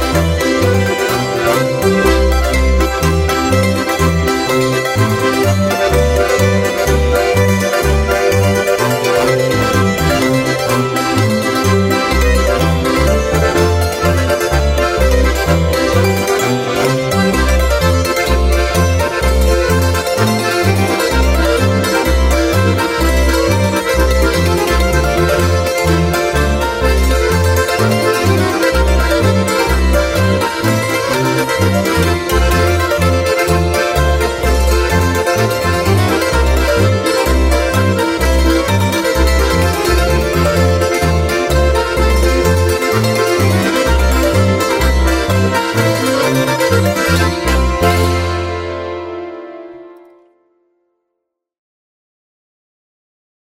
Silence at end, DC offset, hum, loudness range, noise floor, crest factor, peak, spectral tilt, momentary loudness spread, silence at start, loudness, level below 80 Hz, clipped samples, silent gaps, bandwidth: 3.6 s; under 0.1%; none; 1 LU; -75 dBFS; 12 dB; 0 dBFS; -5 dB/octave; 2 LU; 0 s; -13 LUFS; -20 dBFS; under 0.1%; none; 16.5 kHz